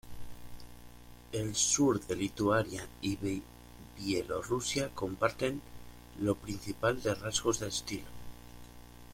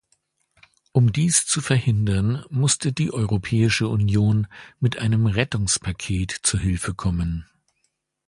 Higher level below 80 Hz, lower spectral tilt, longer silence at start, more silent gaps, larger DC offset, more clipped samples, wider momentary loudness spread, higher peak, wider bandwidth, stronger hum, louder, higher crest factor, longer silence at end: second, -54 dBFS vs -40 dBFS; about the same, -3.5 dB/octave vs -4.5 dB/octave; second, 0.05 s vs 0.95 s; neither; neither; neither; first, 23 LU vs 7 LU; second, -14 dBFS vs -4 dBFS; first, 16.5 kHz vs 11.5 kHz; first, 60 Hz at -50 dBFS vs none; second, -33 LUFS vs -22 LUFS; about the same, 22 dB vs 18 dB; second, 0 s vs 0.85 s